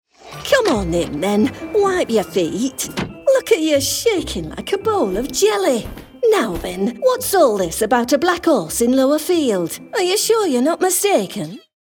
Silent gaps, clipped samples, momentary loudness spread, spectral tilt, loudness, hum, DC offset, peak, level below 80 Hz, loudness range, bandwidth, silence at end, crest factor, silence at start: none; under 0.1%; 8 LU; -3.5 dB/octave; -17 LUFS; none; under 0.1%; -2 dBFS; -42 dBFS; 2 LU; 19 kHz; 0.25 s; 14 dB; 0.25 s